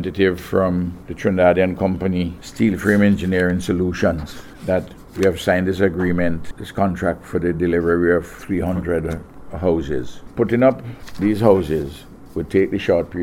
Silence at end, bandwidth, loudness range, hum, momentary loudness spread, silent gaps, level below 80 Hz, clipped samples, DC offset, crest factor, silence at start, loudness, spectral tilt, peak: 0 s; 16.5 kHz; 3 LU; none; 14 LU; none; -40 dBFS; under 0.1%; under 0.1%; 18 dB; 0 s; -19 LUFS; -7 dB/octave; 0 dBFS